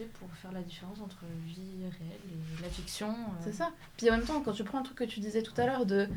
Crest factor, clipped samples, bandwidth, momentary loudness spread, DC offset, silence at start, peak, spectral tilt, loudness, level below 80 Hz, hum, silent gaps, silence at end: 22 dB; under 0.1%; over 20 kHz; 15 LU; under 0.1%; 0 s; -14 dBFS; -5.5 dB/octave; -36 LUFS; -52 dBFS; none; none; 0 s